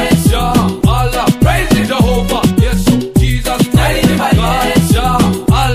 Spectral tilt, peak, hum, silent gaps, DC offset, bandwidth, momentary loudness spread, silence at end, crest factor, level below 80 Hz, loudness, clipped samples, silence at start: -5.5 dB/octave; 0 dBFS; none; none; under 0.1%; 15.5 kHz; 2 LU; 0 s; 10 dB; -18 dBFS; -12 LUFS; under 0.1%; 0 s